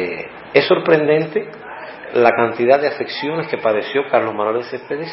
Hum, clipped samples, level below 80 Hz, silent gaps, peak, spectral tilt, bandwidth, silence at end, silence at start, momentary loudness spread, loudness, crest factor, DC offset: none; under 0.1%; -64 dBFS; none; 0 dBFS; -9 dB/octave; 5.8 kHz; 0 s; 0 s; 13 LU; -17 LUFS; 18 dB; under 0.1%